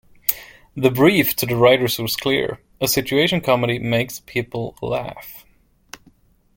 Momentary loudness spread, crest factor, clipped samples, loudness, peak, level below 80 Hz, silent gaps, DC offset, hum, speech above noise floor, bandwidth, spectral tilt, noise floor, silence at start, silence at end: 14 LU; 20 dB; under 0.1%; -19 LUFS; 0 dBFS; -50 dBFS; none; under 0.1%; none; 36 dB; 17 kHz; -4.5 dB/octave; -55 dBFS; 0.3 s; 1.15 s